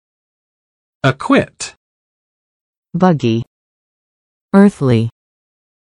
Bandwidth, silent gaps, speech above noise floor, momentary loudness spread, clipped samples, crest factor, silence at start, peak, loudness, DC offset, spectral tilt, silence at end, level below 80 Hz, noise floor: 11 kHz; 1.77-2.83 s, 3.47-4.49 s; over 77 dB; 16 LU; under 0.1%; 18 dB; 1.05 s; 0 dBFS; -14 LUFS; under 0.1%; -7 dB/octave; 0.85 s; -52 dBFS; under -90 dBFS